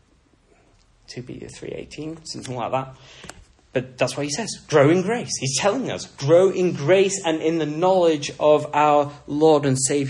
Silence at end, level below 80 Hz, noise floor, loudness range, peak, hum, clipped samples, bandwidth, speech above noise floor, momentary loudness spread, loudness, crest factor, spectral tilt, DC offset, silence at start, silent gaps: 0 s; -58 dBFS; -59 dBFS; 14 LU; -4 dBFS; none; under 0.1%; 11 kHz; 38 dB; 19 LU; -20 LUFS; 18 dB; -4.5 dB/octave; under 0.1%; 1.1 s; none